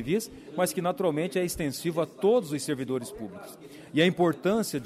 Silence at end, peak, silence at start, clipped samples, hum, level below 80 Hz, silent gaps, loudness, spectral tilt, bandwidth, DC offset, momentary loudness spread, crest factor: 0 s; -12 dBFS; 0 s; under 0.1%; none; -58 dBFS; none; -28 LUFS; -5 dB/octave; 15.5 kHz; under 0.1%; 15 LU; 16 dB